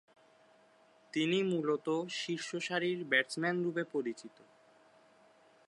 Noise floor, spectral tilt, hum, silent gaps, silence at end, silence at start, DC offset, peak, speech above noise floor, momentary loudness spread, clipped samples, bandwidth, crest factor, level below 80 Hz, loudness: -65 dBFS; -4.5 dB/octave; none; none; 1.4 s; 1.15 s; under 0.1%; -14 dBFS; 31 dB; 9 LU; under 0.1%; 11.5 kHz; 22 dB; -88 dBFS; -34 LUFS